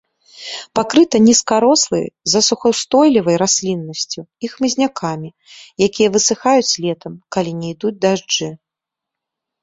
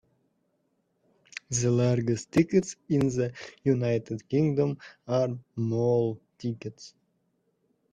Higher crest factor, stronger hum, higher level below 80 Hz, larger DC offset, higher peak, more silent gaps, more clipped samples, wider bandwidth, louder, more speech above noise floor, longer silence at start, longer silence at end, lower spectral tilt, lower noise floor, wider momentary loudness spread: about the same, 16 dB vs 18 dB; neither; first, -56 dBFS vs -62 dBFS; neither; first, -2 dBFS vs -10 dBFS; neither; neither; second, 8 kHz vs 10 kHz; first, -15 LUFS vs -28 LUFS; first, 68 dB vs 47 dB; second, 0.35 s vs 1.5 s; about the same, 1.05 s vs 1.05 s; second, -3.5 dB/octave vs -6.5 dB/octave; first, -84 dBFS vs -74 dBFS; first, 15 LU vs 12 LU